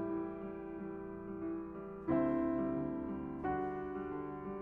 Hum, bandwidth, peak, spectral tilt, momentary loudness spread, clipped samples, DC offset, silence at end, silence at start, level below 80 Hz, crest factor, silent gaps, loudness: none; 3.6 kHz; -22 dBFS; -10.5 dB/octave; 10 LU; under 0.1%; under 0.1%; 0 s; 0 s; -60 dBFS; 18 dB; none; -40 LUFS